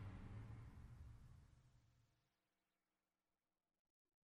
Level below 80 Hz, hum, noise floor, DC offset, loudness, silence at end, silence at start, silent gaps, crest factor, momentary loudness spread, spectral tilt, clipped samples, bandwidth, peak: -68 dBFS; none; under -90 dBFS; under 0.1%; -60 LUFS; 2.25 s; 0 s; none; 16 dB; 9 LU; -7.5 dB/octave; under 0.1%; 11 kHz; -46 dBFS